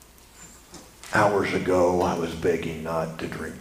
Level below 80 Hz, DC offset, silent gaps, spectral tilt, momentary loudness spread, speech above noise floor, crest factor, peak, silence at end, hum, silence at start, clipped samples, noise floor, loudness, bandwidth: -50 dBFS; under 0.1%; none; -5.5 dB/octave; 22 LU; 25 dB; 20 dB; -6 dBFS; 0 s; none; 0.35 s; under 0.1%; -49 dBFS; -25 LUFS; 15.5 kHz